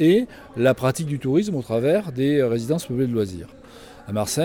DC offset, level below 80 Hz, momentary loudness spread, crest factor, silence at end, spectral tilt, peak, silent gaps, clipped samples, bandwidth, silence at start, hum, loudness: under 0.1%; -52 dBFS; 10 LU; 16 dB; 0 s; -6 dB/octave; -6 dBFS; none; under 0.1%; 18 kHz; 0 s; none; -22 LUFS